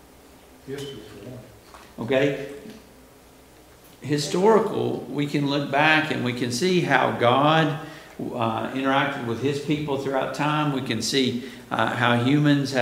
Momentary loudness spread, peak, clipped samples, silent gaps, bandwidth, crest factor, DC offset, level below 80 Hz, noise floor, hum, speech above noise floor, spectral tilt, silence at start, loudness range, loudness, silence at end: 18 LU; -2 dBFS; under 0.1%; none; 16 kHz; 22 dB; under 0.1%; -60 dBFS; -50 dBFS; none; 27 dB; -5 dB/octave; 0.65 s; 9 LU; -23 LUFS; 0 s